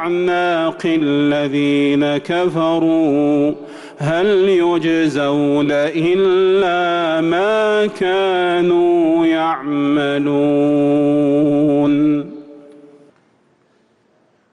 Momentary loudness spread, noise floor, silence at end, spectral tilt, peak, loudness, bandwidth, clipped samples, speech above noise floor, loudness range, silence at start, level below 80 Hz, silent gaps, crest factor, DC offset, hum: 4 LU; -57 dBFS; 1.9 s; -7 dB/octave; -6 dBFS; -15 LUFS; 10 kHz; under 0.1%; 43 dB; 2 LU; 0 s; -56 dBFS; none; 8 dB; under 0.1%; none